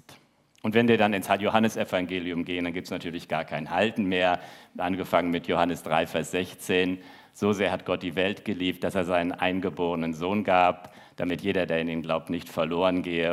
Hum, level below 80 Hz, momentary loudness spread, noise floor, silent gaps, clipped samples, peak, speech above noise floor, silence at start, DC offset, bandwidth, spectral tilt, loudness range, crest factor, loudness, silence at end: none; -66 dBFS; 8 LU; -60 dBFS; none; under 0.1%; -6 dBFS; 33 dB; 0.1 s; under 0.1%; 15.5 kHz; -5.5 dB/octave; 2 LU; 22 dB; -27 LUFS; 0 s